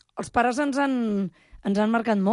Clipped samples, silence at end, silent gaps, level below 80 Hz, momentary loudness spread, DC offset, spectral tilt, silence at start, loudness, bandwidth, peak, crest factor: under 0.1%; 0 s; none; -56 dBFS; 7 LU; under 0.1%; -6 dB/octave; 0.15 s; -25 LUFS; 11.5 kHz; -8 dBFS; 16 dB